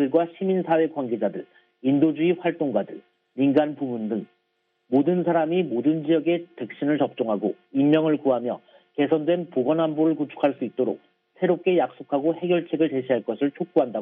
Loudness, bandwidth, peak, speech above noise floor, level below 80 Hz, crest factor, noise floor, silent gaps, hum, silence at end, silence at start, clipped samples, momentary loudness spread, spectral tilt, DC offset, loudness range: -24 LUFS; 3.9 kHz; -6 dBFS; 50 dB; -74 dBFS; 18 dB; -73 dBFS; none; none; 0 s; 0 s; under 0.1%; 8 LU; -6 dB/octave; under 0.1%; 2 LU